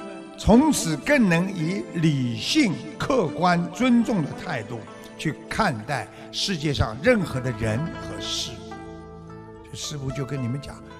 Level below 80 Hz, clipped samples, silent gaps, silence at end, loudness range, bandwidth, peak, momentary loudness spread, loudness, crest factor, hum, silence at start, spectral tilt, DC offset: -44 dBFS; under 0.1%; none; 0 s; 7 LU; 14.5 kHz; -6 dBFS; 19 LU; -24 LUFS; 18 dB; none; 0 s; -5 dB/octave; under 0.1%